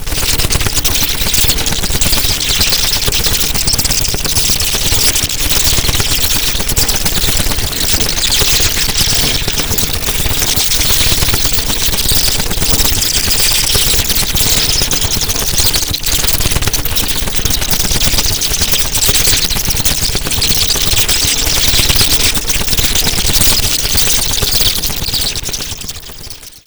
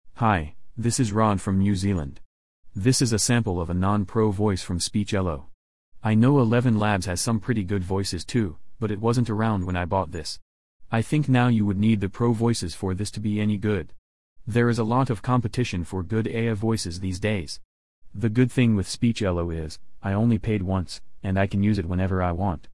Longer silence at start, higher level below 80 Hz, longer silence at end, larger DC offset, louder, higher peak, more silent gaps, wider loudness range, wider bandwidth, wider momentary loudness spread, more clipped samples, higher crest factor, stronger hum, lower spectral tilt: about the same, 0 s vs 0.1 s; first, -20 dBFS vs -48 dBFS; about the same, 0.1 s vs 0.15 s; second, under 0.1% vs 0.9%; first, -10 LUFS vs -24 LUFS; first, 0 dBFS vs -8 dBFS; second, none vs 2.25-2.63 s, 5.54-5.92 s, 10.42-10.80 s, 13.98-14.36 s, 17.65-18.02 s; about the same, 2 LU vs 2 LU; first, over 20 kHz vs 12 kHz; second, 4 LU vs 10 LU; neither; about the same, 12 dB vs 16 dB; neither; second, -1.5 dB/octave vs -6 dB/octave